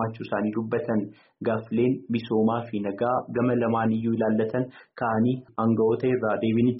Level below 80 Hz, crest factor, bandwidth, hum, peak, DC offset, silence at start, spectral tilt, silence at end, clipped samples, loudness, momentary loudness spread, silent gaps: -64 dBFS; 12 dB; 5.6 kHz; none; -12 dBFS; under 0.1%; 0 s; -7 dB/octave; 0 s; under 0.1%; -26 LUFS; 6 LU; none